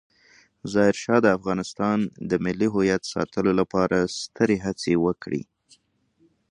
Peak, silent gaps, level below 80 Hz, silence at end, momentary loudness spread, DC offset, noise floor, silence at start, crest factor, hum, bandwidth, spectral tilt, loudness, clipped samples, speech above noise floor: -4 dBFS; none; -54 dBFS; 1.1 s; 8 LU; under 0.1%; -65 dBFS; 0.65 s; 20 dB; none; 11 kHz; -6 dB/octave; -24 LUFS; under 0.1%; 42 dB